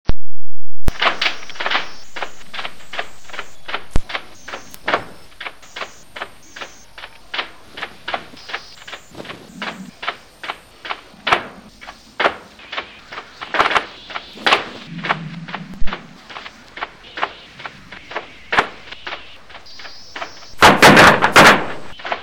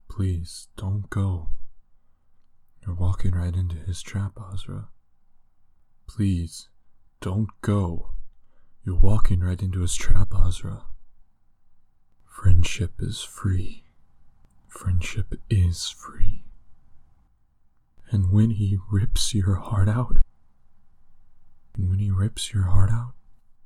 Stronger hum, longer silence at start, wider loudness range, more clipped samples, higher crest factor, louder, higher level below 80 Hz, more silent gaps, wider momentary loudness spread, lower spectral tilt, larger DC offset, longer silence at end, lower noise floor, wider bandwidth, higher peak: neither; about the same, 0.1 s vs 0.1 s; first, 16 LU vs 6 LU; neither; about the same, 14 dB vs 18 dB; first, -16 LUFS vs -26 LUFS; second, -34 dBFS vs -28 dBFS; neither; first, 23 LU vs 16 LU; second, -3.5 dB/octave vs -6 dB/octave; neither; second, 0.05 s vs 0.45 s; second, -40 dBFS vs -59 dBFS; first, 17.5 kHz vs 11.5 kHz; about the same, -2 dBFS vs -4 dBFS